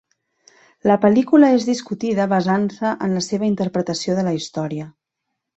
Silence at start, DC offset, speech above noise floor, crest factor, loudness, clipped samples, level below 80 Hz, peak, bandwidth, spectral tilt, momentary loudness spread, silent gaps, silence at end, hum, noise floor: 0.85 s; under 0.1%; 61 dB; 16 dB; -19 LUFS; under 0.1%; -60 dBFS; -2 dBFS; 8.2 kHz; -6 dB/octave; 12 LU; none; 0.7 s; none; -79 dBFS